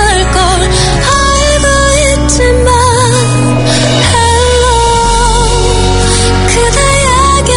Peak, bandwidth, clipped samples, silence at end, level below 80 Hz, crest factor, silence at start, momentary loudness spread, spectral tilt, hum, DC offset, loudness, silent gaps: 0 dBFS; 11.5 kHz; 0.6%; 0 s; -14 dBFS; 8 dB; 0 s; 2 LU; -3.5 dB/octave; none; under 0.1%; -8 LUFS; none